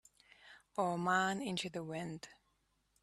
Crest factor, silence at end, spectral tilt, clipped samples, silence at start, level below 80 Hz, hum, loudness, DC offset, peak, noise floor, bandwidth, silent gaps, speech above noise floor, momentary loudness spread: 20 dB; 0.7 s; -4.5 dB/octave; under 0.1%; 0.45 s; -76 dBFS; none; -38 LUFS; under 0.1%; -20 dBFS; -79 dBFS; 13 kHz; none; 41 dB; 18 LU